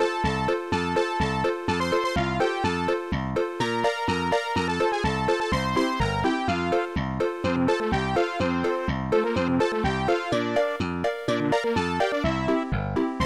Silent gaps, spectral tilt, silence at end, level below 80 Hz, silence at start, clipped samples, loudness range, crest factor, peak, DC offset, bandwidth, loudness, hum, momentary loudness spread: none; -6 dB/octave; 0 s; -42 dBFS; 0 s; under 0.1%; 1 LU; 12 dB; -12 dBFS; 0.1%; 13.5 kHz; -25 LUFS; none; 3 LU